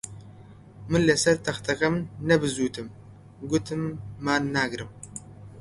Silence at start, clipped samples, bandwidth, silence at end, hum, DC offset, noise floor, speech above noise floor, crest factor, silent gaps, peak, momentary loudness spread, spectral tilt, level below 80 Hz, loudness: 0.05 s; under 0.1%; 11.5 kHz; 0 s; none; under 0.1%; -48 dBFS; 22 dB; 20 dB; none; -6 dBFS; 19 LU; -4.5 dB/octave; -52 dBFS; -25 LUFS